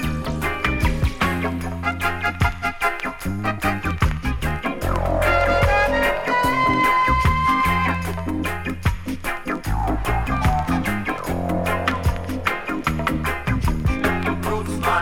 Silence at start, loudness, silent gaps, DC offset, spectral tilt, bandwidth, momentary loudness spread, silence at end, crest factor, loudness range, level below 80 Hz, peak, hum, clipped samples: 0 s; -21 LUFS; none; under 0.1%; -6 dB/octave; 17.5 kHz; 8 LU; 0 s; 16 dB; 5 LU; -28 dBFS; -4 dBFS; none; under 0.1%